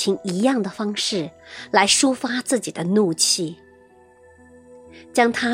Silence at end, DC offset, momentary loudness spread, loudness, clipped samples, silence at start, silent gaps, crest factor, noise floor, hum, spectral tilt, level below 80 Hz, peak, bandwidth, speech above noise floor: 0 s; under 0.1%; 10 LU; -20 LUFS; under 0.1%; 0 s; none; 22 dB; -51 dBFS; none; -3 dB/octave; -62 dBFS; 0 dBFS; 16 kHz; 30 dB